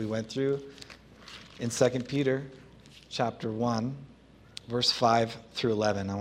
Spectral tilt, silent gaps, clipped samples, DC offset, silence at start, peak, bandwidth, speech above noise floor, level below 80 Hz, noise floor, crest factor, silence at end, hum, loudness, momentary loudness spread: -5 dB/octave; none; under 0.1%; under 0.1%; 0 s; -10 dBFS; 15.5 kHz; 24 dB; -62 dBFS; -53 dBFS; 22 dB; 0 s; none; -29 LUFS; 21 LU